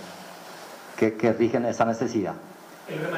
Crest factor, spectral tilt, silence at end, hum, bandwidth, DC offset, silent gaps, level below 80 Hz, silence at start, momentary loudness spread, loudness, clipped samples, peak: 16 dB; -6 dB/octave; 0 s; none; 16 kHz; under 0.1%; none; -68 dBFS; 0 s; 18 LU; -25 LUFS; under 0.1%; -10 dBFS